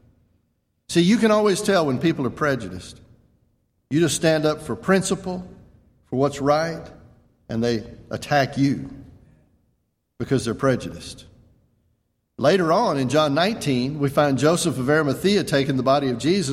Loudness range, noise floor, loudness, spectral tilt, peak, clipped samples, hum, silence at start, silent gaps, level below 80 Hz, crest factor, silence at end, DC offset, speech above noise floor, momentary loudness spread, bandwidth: 6 LU; -71 dBFS; -21 LUFS; -5.5 dB/octave; -4 dBFS; under 0.1%; none; 0.9 s; none; -52 dBFS; 18 dB; 0 s; under 0.1%; 50 dB; 14 LU; 16 kHz